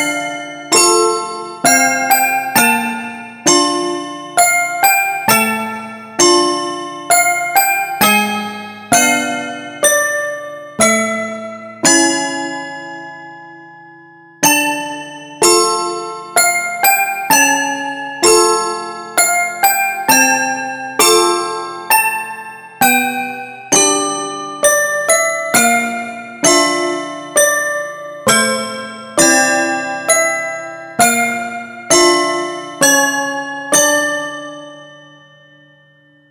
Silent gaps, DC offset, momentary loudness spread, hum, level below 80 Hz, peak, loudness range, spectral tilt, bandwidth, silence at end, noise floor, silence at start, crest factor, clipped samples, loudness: none; under 0.1%; 15 LU; none; -58 dBFS; 0 dBFS; 3 LU; -1 dB/octave; over 20 kHz; 1.3 s; -49 dBFS; 0 s; 16 dB; under 0.1%; -13 LUFS